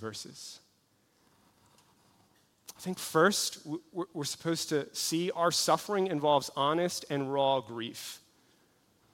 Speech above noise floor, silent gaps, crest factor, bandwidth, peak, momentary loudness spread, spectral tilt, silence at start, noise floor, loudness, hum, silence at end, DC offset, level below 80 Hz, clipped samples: 39 dB; none; 20 dB; 16.5 kHz; -12 dBFS; 17 LU; -3.5 dB/octave; 0 s; -70 dBFS; -31 LUFS; none; 0.95 s; under 0.1%; -78 dBFS; under 0.1%